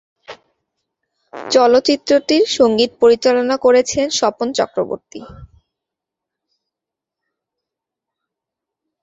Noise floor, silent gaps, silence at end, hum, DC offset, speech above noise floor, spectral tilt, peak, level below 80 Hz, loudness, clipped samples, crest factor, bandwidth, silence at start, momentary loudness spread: -85 dBFS; none; 3.55 s; none; under 0.1%; 70 dB; -3 dB/octave; 0 dBFS; -54 dBFS; -15 LUFS; under 0.1%; 18 dB; 8 kHz; 0.3 s; 12 LU